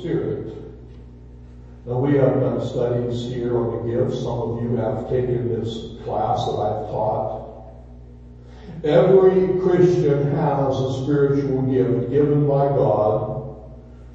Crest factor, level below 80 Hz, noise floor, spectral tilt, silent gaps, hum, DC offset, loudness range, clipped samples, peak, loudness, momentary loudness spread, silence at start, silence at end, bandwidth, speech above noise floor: 18 dB; -44 dBFS; -41 dBFS; -9 dB/octave; none; 60 Hz at -40 dBFS; under 0.1%; 6 LU; under 0.1%; -2 dBFS; -20 LUFS; 14 LU; 0 s; 0 s; 7.6 kHz; 21 dB